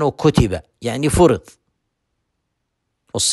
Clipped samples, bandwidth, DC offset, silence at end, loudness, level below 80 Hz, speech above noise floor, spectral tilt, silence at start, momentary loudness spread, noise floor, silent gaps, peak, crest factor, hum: under 0.1%; 12.5 kHz; under 0.1%; 0 s; -17 LUFS; -34 dBFS; 57 dB; -5 dB/octave; 0 s; 11 LU; -74 dBFS; none; -2 dBFS; 18 dB; none